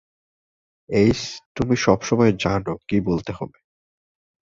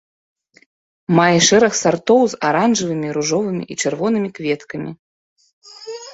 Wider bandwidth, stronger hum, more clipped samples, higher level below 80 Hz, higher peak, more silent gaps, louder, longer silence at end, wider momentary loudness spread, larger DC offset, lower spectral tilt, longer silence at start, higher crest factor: about the same, 7.8 kHz vs 8.2 kHz; neither; neither; first, -46 dBFS vs -58 dBFS; about the same, -2 dBFS vs 0 dBFS; second, 1.46-1.55 s vs 4.99-5.36 s, 5.53-5.62 s; second, -21 LUFS vs -16 LUFS; first, 1 s vs 0 s; second, 13 LU vs 19 LU; neither; first, -6 dB/octave vs -4 dB/octave; second, 0.9 s vs 1.1 s; about the same, 20 dB vs 18 dB